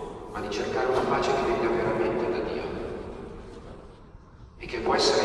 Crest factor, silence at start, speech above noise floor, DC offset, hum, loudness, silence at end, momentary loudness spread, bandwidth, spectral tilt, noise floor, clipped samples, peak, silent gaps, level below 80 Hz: 18 dB; 0 s; 23 dB; under 0.1%; none; -27 LUFS; 0 s; 18 LU; 11.5 kHz; -4.5 dB/octave; -48 dBFS; under 0.1%; -10 dBFS; none; -48 dBFS